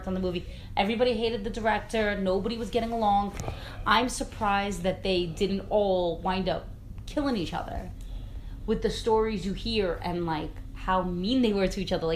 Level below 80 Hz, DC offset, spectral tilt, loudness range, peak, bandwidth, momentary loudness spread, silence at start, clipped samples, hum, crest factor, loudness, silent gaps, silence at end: -40 dBFS; under 0.1%; -5.5 dB/octave; 3 LU; -8 dBFS; 15 kHz; 12 LU; 0 s; under 0.1%; none; 20 dB; -28 LUFS; none; 0 s